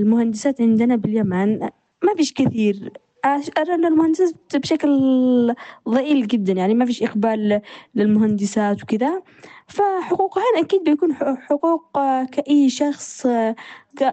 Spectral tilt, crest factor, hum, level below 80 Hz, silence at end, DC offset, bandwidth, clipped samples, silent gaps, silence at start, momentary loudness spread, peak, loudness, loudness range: -6 dB/octave; 14 dB; none; -62 dBFS; 0 s; under 0.1%; 8.8 kHz; under 0.1%; none; 0 s; 7 LU; -6 dBFS; -19 LUFS; 2 LU